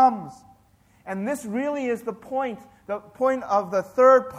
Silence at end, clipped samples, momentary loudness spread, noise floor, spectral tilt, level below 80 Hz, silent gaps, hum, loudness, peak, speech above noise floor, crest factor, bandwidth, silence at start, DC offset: 0 s; under 0.1%; 17 LU; -59 dBFS; -6 dB/octave; -66 dBFS; none; none; -24 LUFS; -4 dBFS; 35 dB; 18 dB; 14.5 kHz; 0 s; under 0.1%